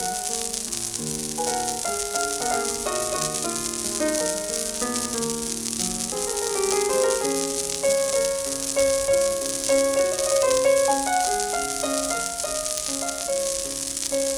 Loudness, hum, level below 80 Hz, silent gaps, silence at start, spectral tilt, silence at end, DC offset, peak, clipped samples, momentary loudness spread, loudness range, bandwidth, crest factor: -23 LUFS; none; -50 dBFS; none; 0 s; -1.5 dB/octave; 0 s; under 0.1%; -6 dBFS; under 0.1%; 5 LU; 4 LU; over 20 kHz; 18 dB